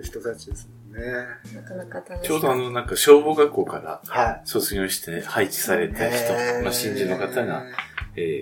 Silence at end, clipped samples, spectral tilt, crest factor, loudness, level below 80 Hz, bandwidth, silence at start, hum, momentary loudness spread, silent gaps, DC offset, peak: 0 s; under 0.1%; -3.5 dB/octave; 22 dB; -22 LUFS; -44 dBFS; 17.5 kHz; 0 s; none; 15 LU; none; under 0.1%; 0 dBFS